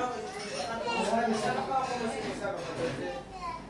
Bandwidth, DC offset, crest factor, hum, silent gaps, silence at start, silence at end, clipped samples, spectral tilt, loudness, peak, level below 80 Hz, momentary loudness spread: 11.5 kHz; under 0.1%; 16 dB; none; none; 0 s; 0 s; under 0.1%; -4 dB/octave; -33 LUFS; -16 dBFS; -58 dBFS; 9 LU